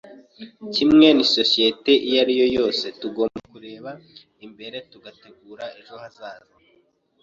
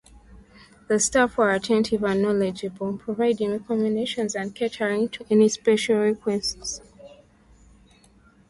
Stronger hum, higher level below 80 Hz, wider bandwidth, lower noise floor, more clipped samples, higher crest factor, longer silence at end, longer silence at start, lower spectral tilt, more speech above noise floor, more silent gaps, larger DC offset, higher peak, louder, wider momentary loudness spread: neither; about the same, -58 dBFS vs -54 dBFS; second, 7.6 kHz vs 11.5 kHz; first, -62 dBFS vs -56 dBFS; neither; about the same, 20 dB vs 16 dB; second, 0.85 s vs 1.4 s; about the same, 0.4 s vs 0.3 s; about the same, -4.5 dB/octave vs -4 dB/octave; first, 41 dB vs 33 dB; neither; neither; first, -2 dBFS vs -8 dBFS; first, -18 LUFS vs -23 LUFS; first, 25 LU vs 9 LU